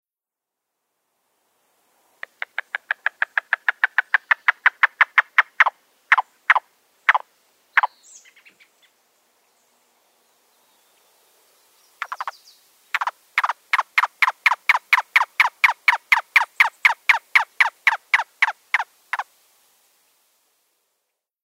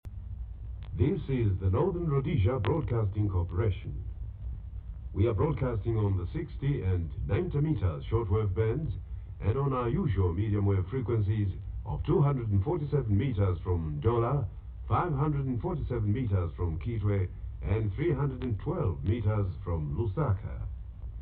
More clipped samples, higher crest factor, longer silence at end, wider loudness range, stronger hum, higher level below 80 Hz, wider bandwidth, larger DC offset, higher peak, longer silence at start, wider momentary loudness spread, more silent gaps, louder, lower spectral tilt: neither; first, 22 dB vs 16 dB; first, 2.2 s vs 0 s; first, 12 LU vs 2 LU; neither; second, under -90 dBFS vs -40 dBFS; first, 16 kHz vs 4.1 kHz; neither; first, 0 dBFS vs -14 dBFS; first, 3.35 s vs 0.05 s; about the same, 13 LU vs 12 LU; neither; first, -19 LUFS vs -30 LUFS; second, 4 dB/octave vs -12 dB/octave